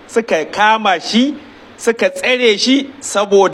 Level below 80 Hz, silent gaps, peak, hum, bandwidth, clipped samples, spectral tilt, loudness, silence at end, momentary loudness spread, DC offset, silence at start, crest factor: -60 dBFS; none; 0 dBFS; none; 14 kHz; under 0.1%; -3 dB/octave; -14 LUFS; 0 s; 7 LU; under 0.1%; 0.1 s; 14 dB